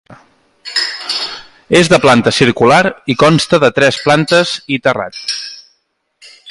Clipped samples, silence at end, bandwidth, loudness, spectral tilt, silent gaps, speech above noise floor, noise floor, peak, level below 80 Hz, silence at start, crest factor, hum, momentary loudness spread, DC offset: under 0.1%; 0 s; 11.5 kHz; -12 LUFS; -4.5 dB/octave; none; 52 dB; -62 dBFS; 0 dBFS; -46 dBFS; 0.1 s; 12 dB; none; 12 LU; under 0.1%